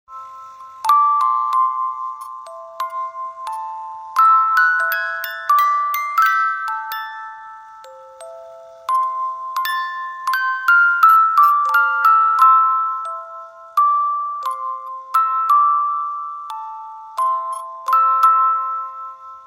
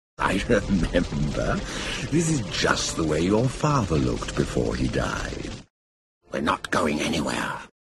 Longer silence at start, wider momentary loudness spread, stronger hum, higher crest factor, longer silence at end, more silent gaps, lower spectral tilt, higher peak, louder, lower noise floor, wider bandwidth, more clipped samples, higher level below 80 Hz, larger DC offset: about the same, 0.1 s vs 0.2 s; first, 20 LU vs 8 LU; neither; about the same, 16 dB vs 20 dB; second, 0 s vs 0.25 s; second, none vs 5.70-6.21 s; second, 2 dB/octave vs -5 dB/octave; about the same, -2 dBFS vs -4 dBFS; first, -16 LUFS vs -25 LUFS; second, -40 dBFS vs under -90 dBFS; first, 16 kHz vs 13 kHz; neither; second, -76 dBFS vs -36 dBFS; neither